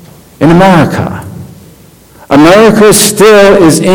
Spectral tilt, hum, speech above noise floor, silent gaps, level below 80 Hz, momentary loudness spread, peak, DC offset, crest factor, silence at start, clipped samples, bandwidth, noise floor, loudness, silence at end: -4.5 dB/octave; none; 33 dB; none; -32 dBFS; 13 LU; 0 dBFS; under 0.1%; 6 dB; 0.4 s; 20%; over 20 kHz; -36 dBFS; -4 LUFS; 0 s